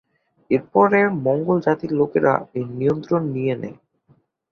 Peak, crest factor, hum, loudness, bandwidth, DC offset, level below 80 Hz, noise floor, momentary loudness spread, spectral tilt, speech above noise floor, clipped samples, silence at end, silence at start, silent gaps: -2 dBFS; 18 dB; none; -20 LUFS; 6.4 kHz; under 0.1%; -60 dBFS; -60 dBFS; 8 LU; -9.5 dB/octave; 40 dB; under 0.1%; 0.8 s; 0.5 s; none